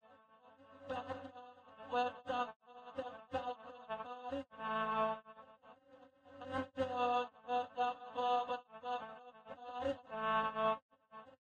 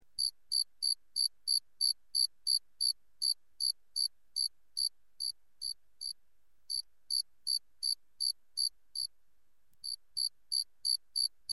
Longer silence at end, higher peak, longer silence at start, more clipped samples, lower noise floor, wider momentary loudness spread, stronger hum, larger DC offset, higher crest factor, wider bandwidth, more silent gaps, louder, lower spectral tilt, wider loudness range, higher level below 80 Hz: about the same, 0.05 s vs 0 s; second, -24 dBFS vs -18 dBFS; about the same, 0.1 s vs 0.2 s; neither; second, -65 dBFS vs -80 dBFS; first, 20 LU vs 10 LU; neither; second, under 0.1% vs 0.1%; about the same, 18 dB vs 20 dB; second, 8.8 kHz vs 12.5 kHz; first, 2.56-2.60 s, 10.82-10.89 s vs none; second, -40 LUFS vs -34 LUFS; first, -5.5 dB/octave vs 4.5 dB/octave; about the same, 4 LU vs 5 LU; about the same, -74 dBFS vs -78 dBFS